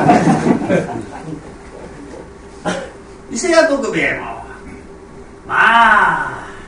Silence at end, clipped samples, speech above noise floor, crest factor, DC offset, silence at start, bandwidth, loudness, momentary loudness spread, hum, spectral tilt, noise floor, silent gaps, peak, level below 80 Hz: 0 s; under 0.1%; 21 dB; 16 dB; under 0.1%; 0 s; 10.5 kHz; -14 LUFS; 24 LU; none; -5 dB/octave; -36 dBFS; none; 0 dBFS; -42 dBFS